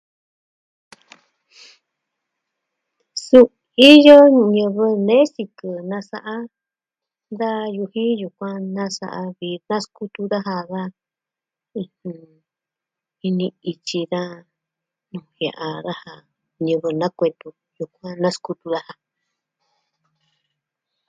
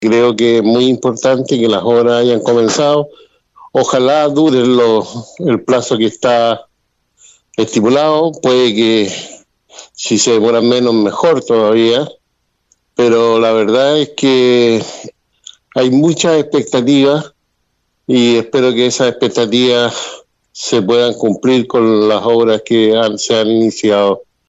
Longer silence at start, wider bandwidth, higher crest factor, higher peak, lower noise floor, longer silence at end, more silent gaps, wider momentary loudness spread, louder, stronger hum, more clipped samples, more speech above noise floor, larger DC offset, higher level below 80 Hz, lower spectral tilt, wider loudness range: first, 3.15 s vs 0 s; first, 11 kHz vs 8.2 kHz; first, 20 dB vs 12 dB; about the same, 0 dBFS vs 0 dBFS; first, -88 dBFS vs -65 dBFS; first, 2.15 s vs 0.25 s; neither; first, 21 LU vs 8 LU; second, -17 LUFS vs -12 LUFS; neither; first, 0.2% vs under 0.1%; first, 70 dB vs 54 dB; neither; second, -68 dBFS vs -60 dBFS; about the same, -5.5 dB/octave vs -4.5 dB/octave; first, 17 LU vs 2 LU